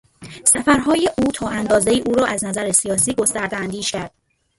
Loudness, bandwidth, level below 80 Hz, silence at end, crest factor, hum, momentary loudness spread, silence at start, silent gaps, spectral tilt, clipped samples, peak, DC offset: -18 LUFS; 12 kHz; -46 dBFS; 0.5 s; 20 dB; none; 9 LU; 0.2 s; none; -3 dB/octave; under 0.1%; 0 dBFS; under 0.1%